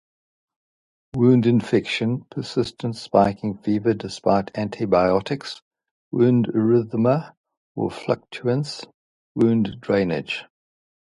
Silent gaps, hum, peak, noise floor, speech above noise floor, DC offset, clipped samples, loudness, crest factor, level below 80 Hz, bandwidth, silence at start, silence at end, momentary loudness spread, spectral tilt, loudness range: 5.62-5.71 s, 5.91-6.11 s, 7.37-7.44 s, 7.57-7.75 s, 8.94-9.35 s; none; -2 dBFS; under -90 dBFS; over 69 dB; under 0.1%; under 0.1%; -22 LUFS; 20 dB; -54 dBFS; 11.5 kHz; 1.15 s; 0.75 s; 12 LU; -7.5 dB/octave; 3 LU